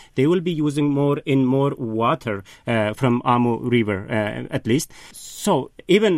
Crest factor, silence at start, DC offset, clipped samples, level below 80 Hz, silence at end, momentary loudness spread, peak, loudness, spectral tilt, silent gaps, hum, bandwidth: 18 dB; 0 s; under 0.1%; under 0.1%; -54 dBFS; 0 s; 8 LU; -4 dBFS; -21 LUFS; -6 dB/octave; none; none; 16 kHz